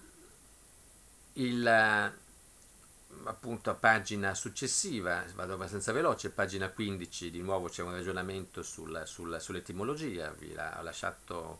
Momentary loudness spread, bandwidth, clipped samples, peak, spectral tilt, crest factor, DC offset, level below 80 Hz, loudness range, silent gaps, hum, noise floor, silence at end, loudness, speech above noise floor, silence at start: 15 LU; 11 kHz; under 0.1%; -10 dBFS; -3.5 dB/octave; 26 dB; under 0.1%; -62 dBFS; 8 LU; none; none; -58 dBFS; 0 s; -34 LUFS; 24 dB; 0 s